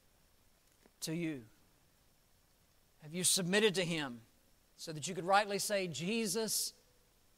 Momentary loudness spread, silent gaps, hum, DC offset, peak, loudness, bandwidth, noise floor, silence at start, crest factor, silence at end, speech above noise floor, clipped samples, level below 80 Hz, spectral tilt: 15 LU; none; none; under 0.1%; -16 dBFS; -35 LUFS; 16 kHz; -70 dBFS; 1 s; 24 dB; 0.65 s; 35 dB; under 0.1%; -74 dBFS; -3 dB/octave